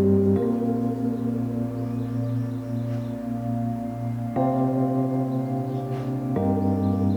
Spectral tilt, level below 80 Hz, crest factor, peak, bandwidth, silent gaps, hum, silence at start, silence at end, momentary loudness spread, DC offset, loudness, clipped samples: -10 dB/octave; -54 dBFS; 14 dB; -10 dBFS; 19 kHz; none; none; 0 s; 0 s; 6 LU; under 0.1%; -26 LUFS; under 0.1%